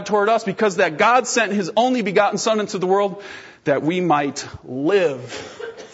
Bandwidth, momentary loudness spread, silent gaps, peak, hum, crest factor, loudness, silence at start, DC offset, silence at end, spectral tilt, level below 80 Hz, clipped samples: 8 kHz; 15 LU; none; -2 dBFS; none; 16 dB; -19 LUFS; 0 s; under 0.1%; 0.05 s; -4 dB/octave; -60 dBFS; under 0.1%